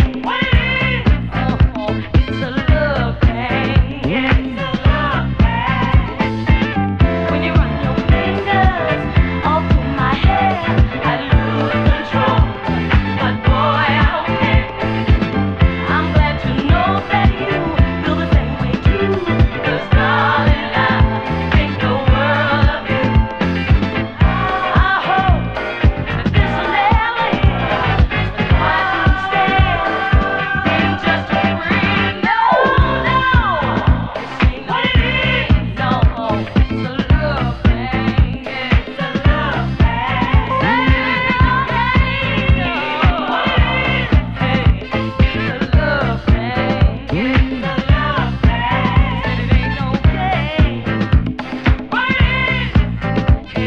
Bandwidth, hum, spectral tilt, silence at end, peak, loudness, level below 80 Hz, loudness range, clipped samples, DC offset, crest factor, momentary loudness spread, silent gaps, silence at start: 6.6 kHz; none; -8 dB/octave; 0 s; 0 dBFS; -16 LUFS; -20 dBFS; 2 LU; under 0.1%; under 0.1%; 14 dB; 4 LU; none; 0 s